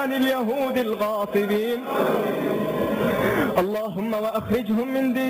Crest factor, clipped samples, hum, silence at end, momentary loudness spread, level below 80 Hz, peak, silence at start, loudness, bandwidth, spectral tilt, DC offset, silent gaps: 14 dB; under 0.1%; none; 0 s; 4 LU; -52 dBFS; -10 dBFS; 0 s; -23 LUFS; 16 kHz; -6 dB/octave; under 0.1%; none